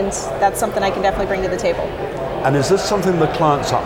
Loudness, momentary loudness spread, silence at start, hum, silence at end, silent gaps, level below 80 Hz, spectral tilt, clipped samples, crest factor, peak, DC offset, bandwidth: -18 LUFS; 6 LU; 0 s; none; 0 s; none; -36 dBFS; -5 dB/octave; under 0.1%; 16 dB; -2 dBFS; under 0.1%; 18 kHz